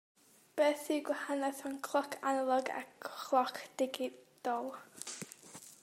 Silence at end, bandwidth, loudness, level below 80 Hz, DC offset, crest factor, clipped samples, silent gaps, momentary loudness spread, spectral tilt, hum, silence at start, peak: 0.1 s; 16 kHz; -37 LUFS; -90 dBFS; under 0.1%; 20 dB; under 0.1%; none; 13 LU; -2.5 dB/octave; none; 0.55 s; -18 dBFS